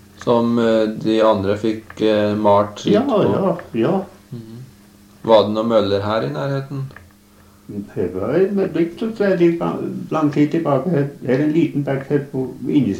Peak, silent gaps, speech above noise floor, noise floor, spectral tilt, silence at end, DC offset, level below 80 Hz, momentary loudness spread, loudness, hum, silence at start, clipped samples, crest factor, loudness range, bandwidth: -2 dBFS; none; 31 dB; -48 dBFS; -7.5 dB/octave; 0 s; under 0.1%; -56 dBFS; 11 LU; -18 LUFS; none; 0.2 s; under 0.1%; 16 dB; 4 LU; 15.5 kHz